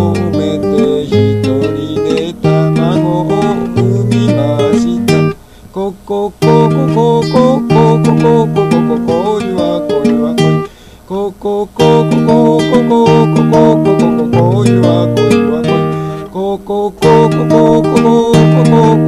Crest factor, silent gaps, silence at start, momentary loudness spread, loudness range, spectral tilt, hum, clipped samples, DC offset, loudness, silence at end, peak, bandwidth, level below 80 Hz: 10 dB; none; 0 s; 9 LU; 4 LU; -7.5 dB/octave; none; 0.6%; 0.2%; -10 LUFS; 0 s; 0 dBFS; 12.5 kHz; -38 dBFS